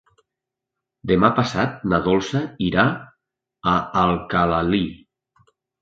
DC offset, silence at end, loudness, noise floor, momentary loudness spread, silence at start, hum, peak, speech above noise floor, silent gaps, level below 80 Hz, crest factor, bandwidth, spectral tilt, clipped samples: under 0.1%; 0.85 s; -20 LUFS; -85 dBFS; 8 LU; 1.05 s; none; 0 dBFS; 65 dB; none; -44 dBFS; 22 dB; 7.8 kHz; -6.5 dB/octave; under 0.1%